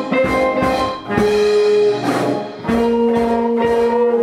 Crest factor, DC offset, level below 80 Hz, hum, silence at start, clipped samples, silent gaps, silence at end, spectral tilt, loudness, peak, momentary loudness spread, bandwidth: 12 dB; under 0.1%; -40 dBFS; none; 0 s; under 0.1%; none; 0 s; -6 dB/octave; -16 LUFS; -4 dBFS; 6 LU; 14.5 kHz